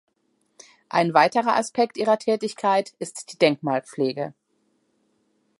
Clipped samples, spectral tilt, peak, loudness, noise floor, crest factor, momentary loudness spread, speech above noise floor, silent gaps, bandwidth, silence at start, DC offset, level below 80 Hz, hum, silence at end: under 0.1%; -4.5 dB/octave; -2 dBFS; -22 LUFS; -70 dBFS; 22 dB; 14 LU; 47 dB; none; 11.5 kHz; 0.95 s; under 0.1%; -78 dBFS; none; 1.3 s